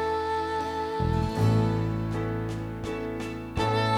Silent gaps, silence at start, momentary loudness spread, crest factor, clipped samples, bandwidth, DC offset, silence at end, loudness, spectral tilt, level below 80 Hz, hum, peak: none; 0 s; 9 LU; 14 dB; under 0.1%; 12.5 kHz; under 0.1%; 0 s; -28 LUFS; -7 dB/octave; -42 dBFS; none; -12 dBFS